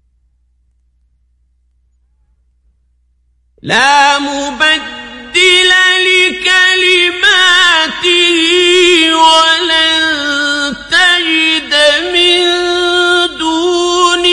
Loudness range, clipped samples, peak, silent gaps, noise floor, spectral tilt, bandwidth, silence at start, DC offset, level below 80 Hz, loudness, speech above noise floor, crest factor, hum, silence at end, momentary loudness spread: 6 LU; 0.2%; 0 dBFS; none; -55 dBFS; -1 dB/octave; 11.5 kHz; 3.65 s; under 0.1%; -46 dBFS; -8 LUFS; 46 dB; 10 dB; 60 Hz at -55 dBFS; 0 s; 7 LU